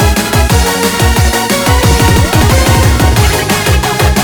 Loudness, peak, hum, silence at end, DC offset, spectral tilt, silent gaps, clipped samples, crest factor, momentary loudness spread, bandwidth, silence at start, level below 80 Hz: -9 LUFS; 0 dBFS; none; 0 s; under 0.1%; -4.5 dB/octave; none; under 0.1%; 8 dB; 3 LU; over 20 kHz; 0 s; -14 dBFS